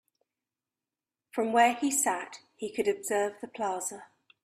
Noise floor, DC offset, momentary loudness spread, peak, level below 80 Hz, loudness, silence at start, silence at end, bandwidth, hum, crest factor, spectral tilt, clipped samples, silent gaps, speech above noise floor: under -90 dBFS; under 0.1%; 14 LU; -12 dBFS; -76 dBFS; -29 LUFS; 1.35 s; 0.4 s; 15.5 kHz; none; 20 dB; -2 dB/octave; under 0.1%; none; over 61 dB